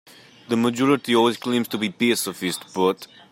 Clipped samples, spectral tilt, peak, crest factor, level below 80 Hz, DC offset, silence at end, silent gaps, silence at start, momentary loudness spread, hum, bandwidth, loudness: under 0.1%; -4 dB/octave; -4 dBFS; 18 dB; -68 dBFS; under 0.1%; 0.25 s; none; 0.5 s; 8 LU; none; 16.5 kHz; -22 LUFS